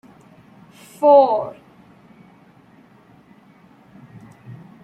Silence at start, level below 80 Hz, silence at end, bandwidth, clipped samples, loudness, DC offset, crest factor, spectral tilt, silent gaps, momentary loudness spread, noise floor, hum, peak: 1 s; -68 dBFS; 0.3 s; 12 kHz; under 0.1%; -15 LUFS; under 0.1%; 20 dB; -7 dB/octave; none; 29 LU; -50 dBFS; none; -2 dBFS